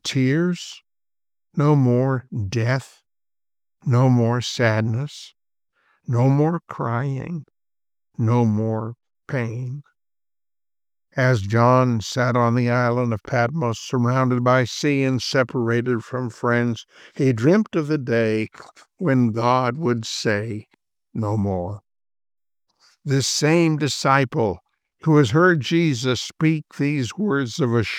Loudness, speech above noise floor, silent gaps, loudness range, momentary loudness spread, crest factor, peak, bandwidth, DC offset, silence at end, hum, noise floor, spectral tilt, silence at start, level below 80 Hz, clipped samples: -21 LUFS; over 70 dB; none; 6 LU; 14 LU; 18 dB; -2 dBFS; 13.5 kHz; under 0.1%; 0 s; none; under -90 dBFS; -6 dB/octave; 0.05 s; -62 dBFS; under 0.1%